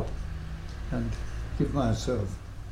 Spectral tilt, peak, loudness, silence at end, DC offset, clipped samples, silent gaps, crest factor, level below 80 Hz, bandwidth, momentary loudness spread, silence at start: -7 dB/octave; -14 dBFS; -32 LUFS; 0 s; under 0.1%; under 0.1%; none; 16 dB; -36 dBFS; 13 kHz; 11 LU; 0 s